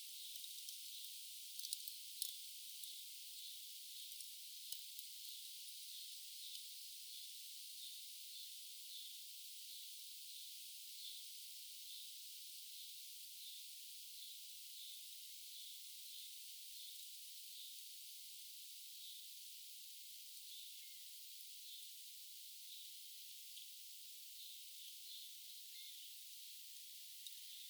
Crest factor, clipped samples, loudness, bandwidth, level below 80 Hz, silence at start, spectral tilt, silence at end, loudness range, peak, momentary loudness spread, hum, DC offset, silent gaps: 32 dB; under 0.1%; -51 LUFS; over 20 kHz; under -90 dBFS; 0 s; 8.5 dB/octave; 0 s; 4 LU; -22 dBFS; 4 LU; none; under 0.1%; none